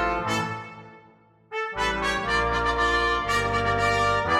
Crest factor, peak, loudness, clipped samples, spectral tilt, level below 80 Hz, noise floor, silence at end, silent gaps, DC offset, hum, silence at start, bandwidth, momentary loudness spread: 14 dB; -10 dBFS; -24 LUFS; under 0.1%; -4 dB/octave; -40 dBFS; -56 dBFS; 0 s; none; under 0.1%; none; 0 s; 16 kHz; 10 LU